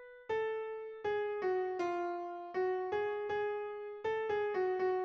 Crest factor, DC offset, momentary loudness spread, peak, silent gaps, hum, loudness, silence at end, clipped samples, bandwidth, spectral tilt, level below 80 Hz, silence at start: 12 dB; under 0.1%; 7 LU; -24 dBFS; none; none; -37 LUFS; 0 s; under 0.1%; 6.8 kHz; -6 dB/octave; -74 dBFS; 0 s